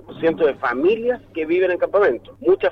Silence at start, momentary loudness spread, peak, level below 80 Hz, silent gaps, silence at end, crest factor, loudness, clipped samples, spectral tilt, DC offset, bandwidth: 0.1 s; 5 LU; -6 dBFS; -54 dBFS; none; 0 s; 12 dB; -20 LUFS; under 0.1%; -7.5 dB/octave; under 0.1%; 5.6 kHz